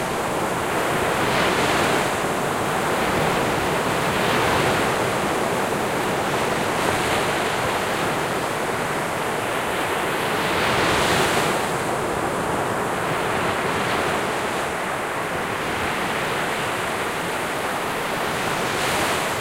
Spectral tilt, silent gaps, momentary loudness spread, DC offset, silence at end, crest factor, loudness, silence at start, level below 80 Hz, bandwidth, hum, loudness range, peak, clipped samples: -3.5 dB/octave; none; 5 LU; under 0.1%; 0 s; 18 dB; -22 LUFS; 0 s; -46 dBFS; 16 kHz; none; 3 LU; -6 dBFS; under 0.1%